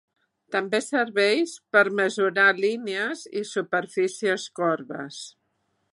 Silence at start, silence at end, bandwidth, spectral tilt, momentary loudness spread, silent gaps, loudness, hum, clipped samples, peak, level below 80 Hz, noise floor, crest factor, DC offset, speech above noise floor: 0.5 s; 0.65 s; 11.5 kHz; -3.5 dB/octave; 12 LU; none; -24 LUFS; none; under 0.1%; -6 dBFS; -82 dBFS; -73 dBFS; 20 dB; under 0.1%; 49 dB